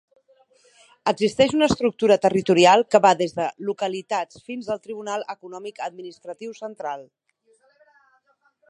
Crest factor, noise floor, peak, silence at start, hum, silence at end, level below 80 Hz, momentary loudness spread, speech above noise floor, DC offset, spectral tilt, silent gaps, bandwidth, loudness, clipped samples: 22 dB; -64 dBFS; -2 dBFS; 1.05 s; none; 1.65 s; -58 dBFS; 19 LU; 43 dB; under 0.1%; -4.5 dB/octave; none; 11.5 kHz; -21 LUFS; under 0.1%